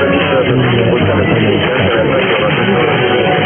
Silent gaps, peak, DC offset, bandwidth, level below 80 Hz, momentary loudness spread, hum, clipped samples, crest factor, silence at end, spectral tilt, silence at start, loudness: none; 0 dBFS; under 0.1%; 3.5 kHz; -38 dBFS; 0 LU; none; under 0.1%; 10 dB; 0 s; -10 dB/octave; 0 s; -11 LUFS